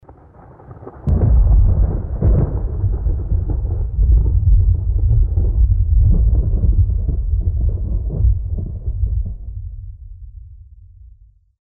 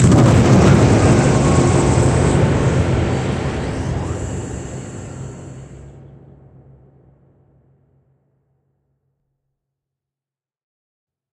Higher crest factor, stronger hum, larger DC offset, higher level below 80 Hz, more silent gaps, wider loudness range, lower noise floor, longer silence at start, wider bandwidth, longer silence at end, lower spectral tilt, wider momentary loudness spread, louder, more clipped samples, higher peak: second, 10 dB vs 18 dB; neither; neither; first, -18 dBFS vs -30 dBFS; neither; second, 8 LU vs 22 LU; second, -47 dBFS vs under -90 dBFS; about the same, 0.1 s vs 0 s; second, 1.6 kHz vs 10.5 kHz; second, 0.55 s vs 5.4 s; first, -14 dB/octave vs -6.5 dB/octave; second, 16 LU vs 20 LU; second, -18 LUFS vs -15 LUFS; neither; second, -6 dBFS vs 0 dBFS